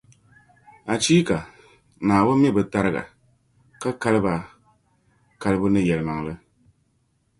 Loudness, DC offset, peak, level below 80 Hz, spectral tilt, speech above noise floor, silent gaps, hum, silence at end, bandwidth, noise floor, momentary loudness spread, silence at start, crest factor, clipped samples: -22 LUFS; under 0.1%; -4 dBFS; -50 dBFS; -5.5 dB/octave; 47 dB; none; none; 1.05 s; 11.5 kHz; -67 dBFS; 18 LU; 0.85 s; 20 dB; under 0.1%